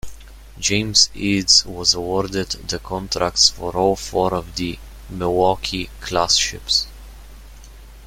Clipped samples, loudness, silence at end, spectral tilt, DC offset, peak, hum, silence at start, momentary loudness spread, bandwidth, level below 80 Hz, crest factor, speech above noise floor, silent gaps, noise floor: under 0.1%; -18 LUFS; 0 s; -2.5 dB/octave; under 0.1%; 0 dBFS; none; 0.05 s; 13 LU; 16.5 kHz; -38 dBFS; 20 dB; 20 dB; none; -40 dBFS